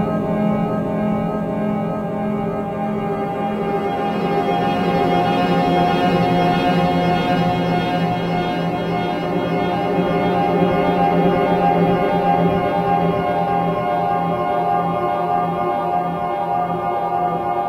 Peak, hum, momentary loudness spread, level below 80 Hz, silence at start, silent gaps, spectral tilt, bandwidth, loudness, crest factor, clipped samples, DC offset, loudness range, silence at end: -2 dBFS; none; 5 LU; -44 dBFS; 0 s; none; -8 dB/octave; 13 kHz; -19 LUFS; 16 dB; under 0.1%; under 0.1%; 4 LU; 0 s